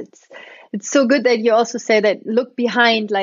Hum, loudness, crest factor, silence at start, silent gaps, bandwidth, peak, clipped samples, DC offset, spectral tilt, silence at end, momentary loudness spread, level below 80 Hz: none; -16 LUFS; 16 dB; 0 s; none; 7.6 kHz; -2 dBFS; under 0.1%; under 0.1%; -3.5 dB/octave; 0 s; 6 LU; -72 dBFS